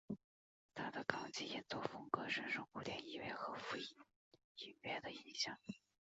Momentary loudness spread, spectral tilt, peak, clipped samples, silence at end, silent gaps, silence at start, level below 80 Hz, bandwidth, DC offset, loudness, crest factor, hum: 13 LU; -1.5 dB/octave; -20 dBFS; under 0.1%; 0.35 s; 0.24-0.69 s, 4.16-4.31 s, 4.44-4.55 s; 0.1 s; -80 dBFS; 8 kHz; under 0.1%; -46 LUFS; 28 dB; none